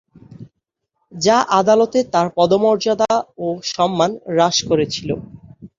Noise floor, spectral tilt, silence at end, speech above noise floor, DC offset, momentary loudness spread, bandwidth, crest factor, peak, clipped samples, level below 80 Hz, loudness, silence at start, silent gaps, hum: -75 dBFS; -4.5 dB/octave; 0.1 s; 59 dB; under 0.1%; 9 LU; 7.6 kHz; 16 dB; -2 dBFS; under 0.1%; -54 dBFS; -17 LUFS; 0.3 s; none; none